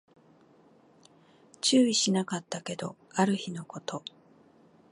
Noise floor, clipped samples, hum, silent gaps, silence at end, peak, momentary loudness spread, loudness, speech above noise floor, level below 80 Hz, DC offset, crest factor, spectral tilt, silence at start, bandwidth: -60 dBFS; under 0.1%; none; none; 0.95 s; -10 dBFS; 16 LU; -29 LUFS; 32 dB; -80 dBFS; under 0.1%; 20 dB; -4 dB/octave; 1.65 s; 11.5 kHz